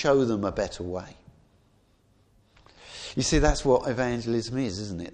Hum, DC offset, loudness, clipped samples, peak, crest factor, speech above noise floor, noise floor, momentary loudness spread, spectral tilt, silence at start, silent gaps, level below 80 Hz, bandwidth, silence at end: none; under 0.1%; -27 LUFS; under 0.1%; -8 dBFS; 18 dB; 38 dB; -63 dBFS; 14 LU; -5 dB/octave; 0 s; none; -38 dBFS; 10.5 kHz; 0 s